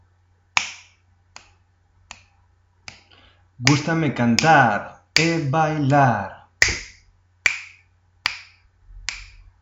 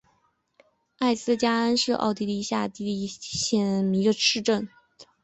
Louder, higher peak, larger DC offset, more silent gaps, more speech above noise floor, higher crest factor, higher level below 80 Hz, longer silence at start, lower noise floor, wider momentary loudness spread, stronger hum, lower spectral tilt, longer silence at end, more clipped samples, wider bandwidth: first, -20 LUFS vs -25 LUFS; first, 0 dBFS vs -8 dBFS; neither; neither; about the same, 42 dB vs 44 dB; first, 24 dB vs 18 dB; first, -48 dBFS vs -62 dBFS; second, 0.55 s vs 1 s; second, -60 dBFS vs -69 dBFS; first, 22 LU vs 9 LU; neither; about the same, -4 dB/octave vs -4 dB/octave; first, 0.35 s vs 0.2 s; neither; first, 11.5 kHz vs 8.4 kHz